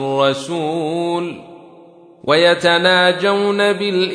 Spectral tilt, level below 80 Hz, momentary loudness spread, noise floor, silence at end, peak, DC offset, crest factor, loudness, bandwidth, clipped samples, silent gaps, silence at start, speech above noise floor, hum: -4.5 dB/octave; -66 dBFS; 11 LU; -44 dBFS; 0 s; 0 dBFS; under 0.1%; 16 dB; -15 LUFS; 10.5 kHz; under 0.1%; none; 0 s; 28 dB; none